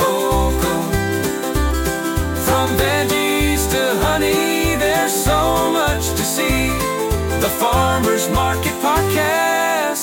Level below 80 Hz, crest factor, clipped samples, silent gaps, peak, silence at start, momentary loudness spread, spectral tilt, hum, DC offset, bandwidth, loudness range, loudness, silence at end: -26 dBFS; 12 dB; under 0.1%; none; -4 dBFS; 0 s; 4 LU; -4 dB/octave; none; under 0.1%; 17 kHz; 2 LU; -17 LUFS; 0 s